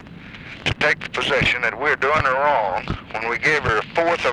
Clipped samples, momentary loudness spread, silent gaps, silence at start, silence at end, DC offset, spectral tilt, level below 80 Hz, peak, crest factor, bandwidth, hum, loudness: under 0.1%; 9 LU; none; 0 s; 0 s; under 0.1%; -4.5 dB/octave; -42 dBFS; -2 dBFS; 18 dB; 12.5 kHz; none; -20 LUFS